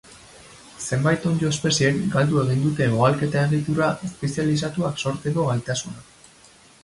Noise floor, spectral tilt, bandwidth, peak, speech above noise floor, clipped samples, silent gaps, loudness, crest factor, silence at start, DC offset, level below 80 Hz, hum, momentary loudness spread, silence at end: -51 dBFS; -5.5 dB/octave; 11.5 kHz; -4 dBFS; 30 dB; under 0.1%; none; -22 LUFS; 18 dB; 0.1 s; under 0.1%; -52 dBFS; none; 8 LU; 0.8 s